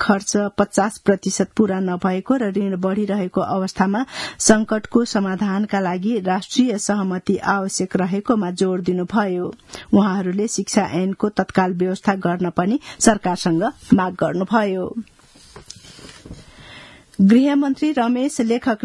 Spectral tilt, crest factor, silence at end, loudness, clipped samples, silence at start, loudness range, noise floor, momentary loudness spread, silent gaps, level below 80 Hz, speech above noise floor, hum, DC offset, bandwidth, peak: -5 dB/octave; 20 dB; 0 s; -19 LUFS; under 0.1%; 0 s; 2 LU; -44 dBFS; 8 LU; none; -52 dBFS; 26 dB; none; under 0.1%; 12 kHz; 0 dBFS